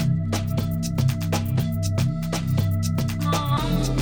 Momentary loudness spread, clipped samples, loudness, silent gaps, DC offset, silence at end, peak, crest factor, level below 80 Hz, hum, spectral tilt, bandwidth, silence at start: 2 LU; under 0.1%; -24 LUFS; none; under 0.1%; 0 s; -10 dBFS; 14 dB; -36 dBFS; none; -6 dB/octave; 18 kHz; 0 s